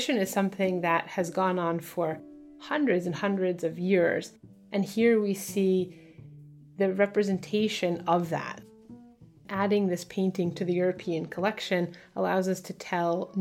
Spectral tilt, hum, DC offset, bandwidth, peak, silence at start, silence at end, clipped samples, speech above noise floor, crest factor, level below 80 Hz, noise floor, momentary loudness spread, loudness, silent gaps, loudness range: -6 dB/octave; none; under 0.1%; 16.5 kHz; -12 dBFS; 0 s; 0 s; under 0.1%; 26 dB; 16 dB; -70 dBFS; -53 dBFS; 8 LU; -28 LUFS; none; 2 LU